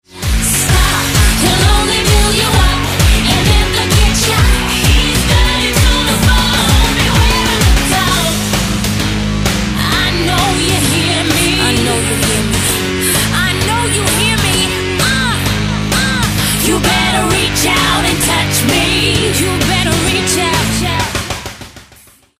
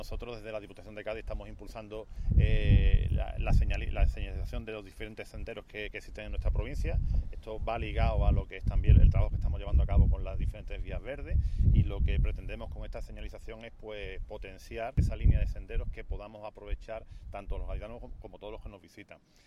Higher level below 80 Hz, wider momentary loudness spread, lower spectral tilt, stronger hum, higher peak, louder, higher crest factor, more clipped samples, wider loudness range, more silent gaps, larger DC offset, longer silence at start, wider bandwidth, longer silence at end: first, -18 dBFS vs -32 dBFS; second, 4 LU vs 18 LU; second, -3.5 dB/octave vs -8 dB/octave; neither; first, 0 dBFS vs -8 dBFS; first, -11 LUFS vs -33 LUFS; second, 12 dB vs 20 dB; neither; second, 2 LU vs 8 LU; neither; neither; first, 0.15 s vs 0 s; first, 16 kHz vs 7 kHz; first, 0.55 s vs 0.35 s